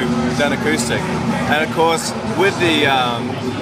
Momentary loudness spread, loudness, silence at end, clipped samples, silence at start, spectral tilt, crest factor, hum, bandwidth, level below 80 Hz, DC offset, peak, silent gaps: 5 LU; -17 LUFS; 0 s; under 0.1%; 0 s; -4.5 dB/octave; 14 dB; none; 15.5 kHz; -42 dBFS; under 0.1%; -2 dBFS; none